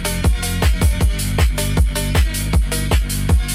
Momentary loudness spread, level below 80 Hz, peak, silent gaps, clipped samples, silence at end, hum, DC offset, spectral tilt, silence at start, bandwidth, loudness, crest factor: 2 LU; -18 dBFS; -4 dBFS; none; under 0.1%; 0 s; none; under 0.1%; -4.5 dB/octave; 0 s; 16.5 kHz; -18 LUFS; 12 dB